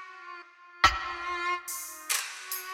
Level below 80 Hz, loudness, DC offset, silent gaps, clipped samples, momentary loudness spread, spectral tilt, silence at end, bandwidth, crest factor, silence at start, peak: -50 dBFS; -29 LUFS; under 0.1%; none; under 0.1%; 20 LU; -0.5 dB/octave; 0 s; 19 kHz; 24 dB; 0 s; -8 dBFS